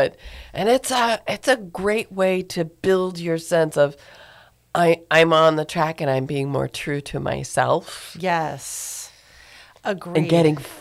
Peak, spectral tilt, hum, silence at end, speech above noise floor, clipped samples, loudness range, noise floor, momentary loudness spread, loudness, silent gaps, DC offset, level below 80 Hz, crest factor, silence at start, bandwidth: -6 dBFS; -5 dB/octave; none; 0 s; 29 dB; under 0.1%; 5 LU; -50 dBFS; 12 LU; -21 LUFS; none; under 0.1%; -52 dBFS; 16 dB; 0 s; 16 kHz